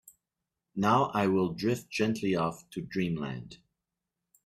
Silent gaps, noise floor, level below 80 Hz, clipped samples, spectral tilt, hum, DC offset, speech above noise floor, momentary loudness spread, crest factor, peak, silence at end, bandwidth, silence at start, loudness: none; -88 dBFS; -64 dBFS; under 0.1%; -6.5 dB/octave; none; under 0.1%; 58 dB; 15 LU; 20 dB; -12 dBFS; 0.9 s; 15 kHz; 0.75 s; -30 LUFS